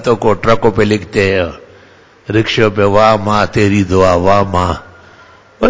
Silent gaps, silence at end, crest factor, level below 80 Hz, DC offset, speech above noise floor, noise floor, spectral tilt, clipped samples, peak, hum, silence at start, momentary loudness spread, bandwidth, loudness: none; 0 s; 12 dB; -32 dBFS; under 0.1%; 32 dB; -43 dBFS; -6 dB/octave; 0.4%; 0 dBFS; none; 0 s; 7 LU; 8 kHz; -12 LUFS